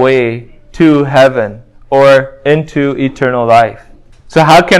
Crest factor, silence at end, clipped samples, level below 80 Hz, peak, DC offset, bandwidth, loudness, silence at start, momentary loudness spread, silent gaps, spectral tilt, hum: 10 dB; 0 s; 2%; -40 dBFS; 0 dBFS; under 0.1%; 16 kHz; -9 LUFS; 0 s; 9 LU; none; -6 dB/octave; none